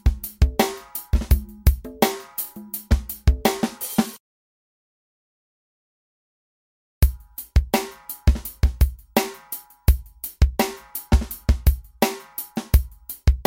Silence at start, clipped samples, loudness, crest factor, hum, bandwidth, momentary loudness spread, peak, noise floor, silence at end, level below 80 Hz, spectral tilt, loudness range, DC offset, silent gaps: 0.05 s; under 0.1%; -24 LUFS; 20 dB; none; 17 kHz; 9 LU; -2 dBFS; -39 dBFS; 0.05 s; -24 dBFS; -5.5 dB/octave; 7 LU; under 0.1%; 4.20-7.01 s